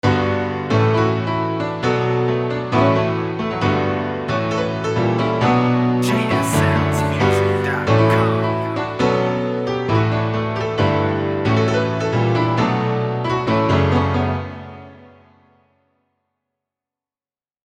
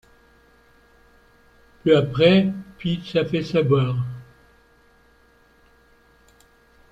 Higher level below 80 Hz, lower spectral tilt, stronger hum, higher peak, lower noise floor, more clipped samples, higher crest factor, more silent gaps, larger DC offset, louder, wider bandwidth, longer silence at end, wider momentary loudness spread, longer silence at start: first, -46 dBFS vs -54 dBFS; second, -6.5 dB/octave vs -8 dB/octave; neither; about the same, -2 dBFS vs -4 dBFS; first, under -90 dBFS vs -57 dBFS; neither; about the same, 16 dB vs 20 dB; neither; neither; first, -18 LUFS vs -21 LUFS; first, 15 kHz vs 8 kHz; about the same, 2.7 s vs 2.7 s; second, 5 LU vs 13 LU; second, 0.05 s vs 1.85 s